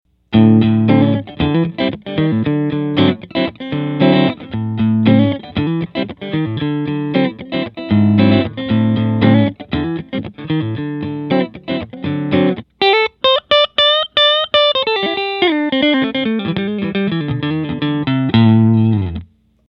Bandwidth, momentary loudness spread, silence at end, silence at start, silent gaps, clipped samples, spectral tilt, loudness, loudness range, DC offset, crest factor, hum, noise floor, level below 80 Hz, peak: 5.8 kHz; 11 LU; 0.45 s; 0.3 s; none; under 0.1%; -8.5 dB/octave; -15 LUFS; 5 LU; under 0.1%; 14 dB; none; -36 dBFS; -44 dBFS; 0 dBFS